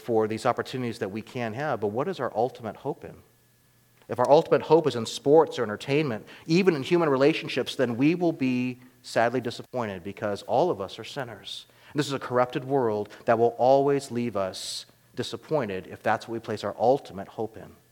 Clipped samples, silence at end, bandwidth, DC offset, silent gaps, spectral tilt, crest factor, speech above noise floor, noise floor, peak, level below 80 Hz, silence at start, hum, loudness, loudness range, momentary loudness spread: under 0.1%; 0.2 s; 17 kHz; under 0.1%; none; -6 dB/octave; 20 dB; 36 dB; -62 dBFS; -6 dBFS; -70 dBFS; 0 s; none; -26 LUFS; 6 LU; 14 LU